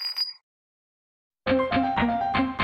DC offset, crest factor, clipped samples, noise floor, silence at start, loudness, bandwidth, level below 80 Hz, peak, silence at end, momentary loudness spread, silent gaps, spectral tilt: under 0.1%; 16 dB; under 0.1%; under -90 dBFS; 0 s; -25 LUFS; 16 kHz; -48 dBFS; -12 dBFS; 0 s; 6 LU; 0.43-1.30 s; -6 dB/octave